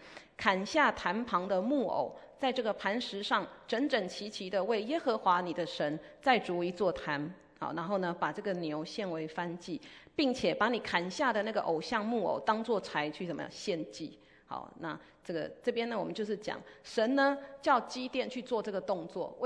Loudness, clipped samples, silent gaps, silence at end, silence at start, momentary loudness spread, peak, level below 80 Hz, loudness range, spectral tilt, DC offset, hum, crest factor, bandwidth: -33 LUFS; under 0.1%; none; 0 s; 0 s; 12 LU; -10 dBFS; -68 dBFS; 5 LU; -5 dB/octave; under 0.1%; none; 22 dB; 10.5 kHz